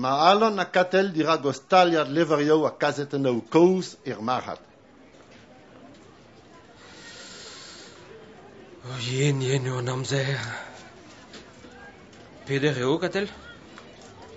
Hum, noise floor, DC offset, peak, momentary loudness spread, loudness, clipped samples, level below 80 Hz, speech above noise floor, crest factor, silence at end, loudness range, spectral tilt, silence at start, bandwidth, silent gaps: none; -52 dBFS; under 0.1%; -4 dBFS; 25 LU; -24 LUFS; under 0.1%; -64 dBFS; 29 dB; 22 dB; 0 s; 22 LU; -5.5 dB/octave; 0 s; 8 kHz; none